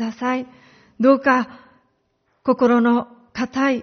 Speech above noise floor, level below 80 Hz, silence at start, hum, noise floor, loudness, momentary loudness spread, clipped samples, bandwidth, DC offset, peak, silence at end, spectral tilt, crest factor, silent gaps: 49 dB; -62 dBFS; 0 s; none; -67 dBFS; -19 LUFS; 14 LU; under 0.1%; 6.6 kHz; under 0.1%; -2 dBFS; 0 s; -4 dB/octave; 18 dB; none